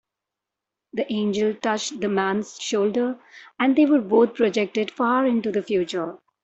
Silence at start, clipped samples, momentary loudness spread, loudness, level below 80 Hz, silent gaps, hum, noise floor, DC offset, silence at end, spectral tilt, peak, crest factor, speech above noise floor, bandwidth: 0.95 s; under 0.1%; 10 LU; -22 LUFS; -66 dBFS; none; none; -86 dBFS; under 0.1%; 0.25 s; -5 dB/octave; -6 dBFS; 16 dB; 64 dB; 8.2 kHz